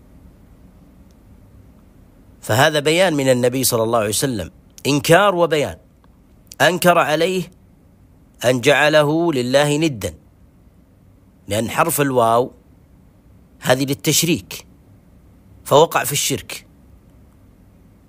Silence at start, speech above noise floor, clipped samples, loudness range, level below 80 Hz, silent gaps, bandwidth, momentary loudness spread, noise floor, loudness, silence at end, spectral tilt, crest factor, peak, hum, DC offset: 2.45 s; 33 dB; under 0.1%; 5 LU; -50 dBFS; none; 16 kHz; 14 LU; -50 dBFS; -17 LUFS; 1.5 s; -4 dB/octave; 18 dB; 0 dBFS; none; under 0.1%